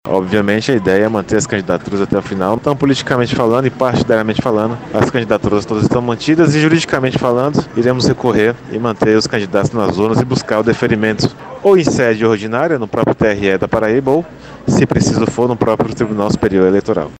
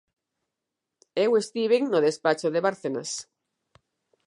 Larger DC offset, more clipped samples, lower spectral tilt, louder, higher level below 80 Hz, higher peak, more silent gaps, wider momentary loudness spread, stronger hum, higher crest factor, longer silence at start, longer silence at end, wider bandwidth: neither; neither; first, -6 dB/octave vs -4 dB/octave; first, -14 LUFS vs -25 LUFS; first, -40 dBFS vs -80 dBFS; first, 0 dBFS vs -8 dBFS; neither; second, 5 LU vs 11 LU; neither; second, 14 dB vs 20 dB; second, 0.05 s vs 1.15 s; second, 0 s vs 1.05 s; first, 15 kHz vs 11.5 kHz